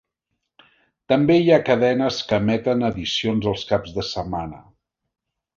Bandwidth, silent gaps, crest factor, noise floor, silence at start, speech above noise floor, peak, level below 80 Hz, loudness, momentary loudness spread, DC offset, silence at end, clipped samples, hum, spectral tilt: 7.6 kHz; none; 18 dB; -78 dBFS; 1.1 s; 58 dB; -2 dBFS; -48 dBFS; -20 LUFS; 11 LU; under 0.1%; 0.95 s; under 0.1%; none; -6 dB/octave